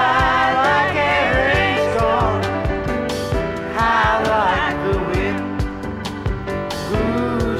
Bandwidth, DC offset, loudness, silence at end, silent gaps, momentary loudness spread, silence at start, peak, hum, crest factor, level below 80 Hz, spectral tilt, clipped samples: 15 kHz; under 0.1%; -18 LUFS; 0 s; none; 9 LU; 0 s; -4 dBFS; none; 16 dB; -30 dBFS; -5.5 dB/octave; under 0.1%